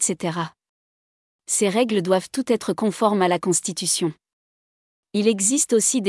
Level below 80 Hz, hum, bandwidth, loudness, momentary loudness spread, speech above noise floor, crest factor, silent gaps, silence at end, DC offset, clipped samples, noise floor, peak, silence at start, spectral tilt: -70 dBFS; none; 12 kHz; -21 LUFS; 9 LU; over 69 dB; 18 dB; 0.69-1.39 s, 4.33-5.03 s; 0 s; under 0.1%; under 0.1%; under -90 dBFS; -6 dBFS; 0 s; -3.5 dB/octave